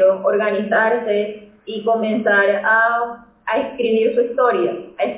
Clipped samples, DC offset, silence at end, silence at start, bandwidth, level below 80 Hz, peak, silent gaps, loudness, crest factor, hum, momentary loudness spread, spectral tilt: under 0.1%; under 0.1%; 0 s; 0 s; 4 kHz; -62 dBFS; -4 dBFS; none; -18 LUFS; 14 dB; none; 11 LU; -8.5 dB/octave